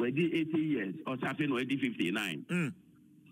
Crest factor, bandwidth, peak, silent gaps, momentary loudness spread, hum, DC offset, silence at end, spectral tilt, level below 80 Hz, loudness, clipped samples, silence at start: 14 dB; 16 kHz; -20 dBFS; none; 5 LU; none; under 0.1%; 0.6 s; -6 dB/octave; -78 dBFS; -33 LUFS; under 0.1%; 0 s